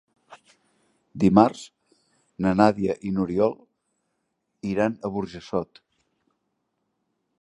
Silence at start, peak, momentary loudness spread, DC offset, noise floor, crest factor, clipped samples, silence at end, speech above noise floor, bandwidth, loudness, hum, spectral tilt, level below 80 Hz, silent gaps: 0.3 s; -2 dBFS; 23 LU; under 0.1%; -77 dBFS; 24 dB; under 0.1%; 1.75 s; 54 dB; 10.5 kHz; -23 LUFS; none; -7.5 dB/octave; -56 dBFS; none